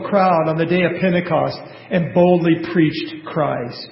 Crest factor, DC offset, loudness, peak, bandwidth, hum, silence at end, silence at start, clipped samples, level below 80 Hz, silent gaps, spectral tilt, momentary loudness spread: 16 dB; under 0.1%; -18 LUFS; -2 dBFS; 5.8 kHz; none; 0 s; 0 s; under 0.1%; -54 dBFS; none; -12 dB/octave; 10 LU